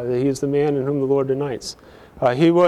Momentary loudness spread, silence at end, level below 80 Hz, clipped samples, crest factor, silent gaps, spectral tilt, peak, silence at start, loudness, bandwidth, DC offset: 12 LU; 0 s; -52 dBFS; under 0.1%; 14 dB; none; -6.5 dB/octave; -6 dBFS; 0 s; -20 LUFS; 12.5 kHz; under 0.1%